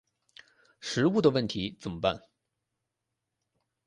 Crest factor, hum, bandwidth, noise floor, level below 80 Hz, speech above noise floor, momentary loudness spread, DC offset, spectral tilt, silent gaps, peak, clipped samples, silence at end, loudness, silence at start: 22 dB; none; 11.5 kHz; -85 dBFS; -60 dBFS; 57 dB; 14 LU; under 0.1%; -5.5 dB/octave; none; -10 dBFS; under 0.1%; 1.7 s; -28 LUFS; 0.8 s